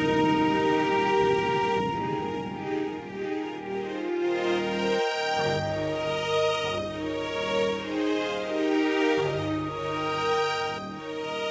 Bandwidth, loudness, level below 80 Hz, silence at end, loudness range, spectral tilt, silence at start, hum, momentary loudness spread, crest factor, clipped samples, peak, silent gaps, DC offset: 8 kHz; -27 LUFS; -54 dBFS; 0 s; 3 LU; -5 dB/octave; 0 s; none; 9 LU; 14 dB; under 0.1%; -12 dBFS; none; under 0.1%